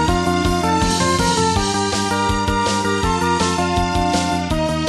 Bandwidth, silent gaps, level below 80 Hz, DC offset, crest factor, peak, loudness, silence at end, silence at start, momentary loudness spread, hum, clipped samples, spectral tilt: 13.5 kHz; none; -30 dBFS; under 0.1%; 14 dB; -4 dBFS; -18 LUFS; 0 s; 0 s; 2 LU; none; under 0.1%; -4.5 dB/octave